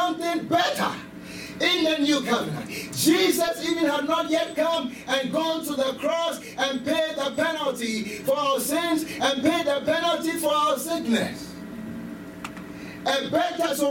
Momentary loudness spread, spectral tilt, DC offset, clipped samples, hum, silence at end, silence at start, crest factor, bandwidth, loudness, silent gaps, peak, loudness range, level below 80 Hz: 15 LU; -3.5 dB/octave; under 0.1%; under 0.1%; none; 0 s; 0 s; 18 dB; 18 kHz; -24 LUFS; none; -8 dBFS; 3 LU; -60 dBFS